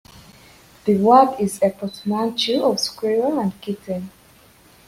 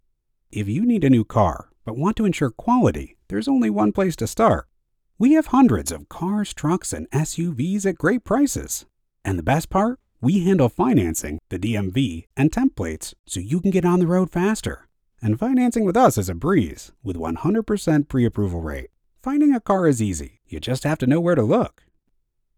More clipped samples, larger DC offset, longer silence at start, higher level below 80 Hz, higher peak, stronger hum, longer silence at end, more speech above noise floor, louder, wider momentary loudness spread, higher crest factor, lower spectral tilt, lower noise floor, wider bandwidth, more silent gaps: neither; neither; first, 0.85 s vs 0.5 s; second, -60 dBFS vs -42 dBFS; about the same, -2 dBFS vs -4 dBFS; neither; about the same, 0.8 s vs 0.9 s; second, 32 dB vs 49 dB; about the same, -20 LUFS vs -21 LUFS; first, 15 LU vs 12 LU; about the same, 18 dB vs 18 dB; second, -5 dB/octave vs -6.5 dB/octave; second, -51 dBFS vs -69 dBFS; second, 16 kHz vs 18 kHz; second, none vs 13.19-13.24 s